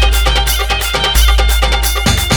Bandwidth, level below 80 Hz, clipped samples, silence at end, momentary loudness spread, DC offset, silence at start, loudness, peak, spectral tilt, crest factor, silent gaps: over 20 kHz; -14 dBFS; under 0.1%; 0 s; 3 LU; under 0.1%; 0 s; -12 LUFS; 0 dBFS; -3 dB/octave; 12 dB; none